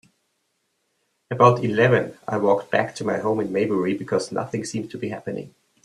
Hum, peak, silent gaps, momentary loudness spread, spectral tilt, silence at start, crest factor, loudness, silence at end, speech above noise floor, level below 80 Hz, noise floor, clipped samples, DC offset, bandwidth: none; 0 dBFS; none; 13 LU; -6.5 dB/octave; 1.3 s; 22 dB; -22 LUFS; 0.35 s; 51 dB; -64 dBFS; -72 dBFS; under 0.1%; under 0.1%; 12 kHz